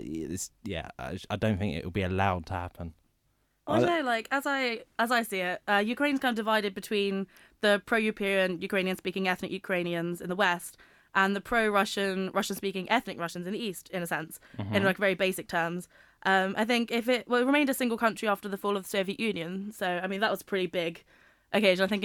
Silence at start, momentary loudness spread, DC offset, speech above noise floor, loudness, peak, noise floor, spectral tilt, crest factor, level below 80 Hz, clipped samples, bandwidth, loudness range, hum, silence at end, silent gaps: 0 s; 10 LU; under 0.1%; 44 dB; -29 LUFS; -10 dBFS; -73 dBFS; -4.5 dB/octave; 20 dB; -58 dBFS; under 0.1%; 19 kHz; 3 LU; none; 0 s; none